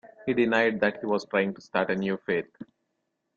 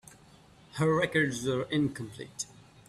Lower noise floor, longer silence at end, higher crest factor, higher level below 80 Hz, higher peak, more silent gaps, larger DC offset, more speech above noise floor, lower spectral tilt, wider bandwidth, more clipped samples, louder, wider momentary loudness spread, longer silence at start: first, -79 dBFS vs -57 dBFS; first, 0.75 s vs 0.35 s; about the same, 20 dB vs 18 dB; second, -68 dBFS vs -62 dBFS; first, -8 dBFS vs -14 dBFS; neither; neither; first, 52 dB vs 27 dB; first, -6.5 dB/octave vs -5 dB/octave; second, 7.4 kHz vs 13.5 kHz; neither; first, -27 LUFS vs -30 LUFS; second, 7 LU vs 15 LU; second, 0.05 s vs 0.75 s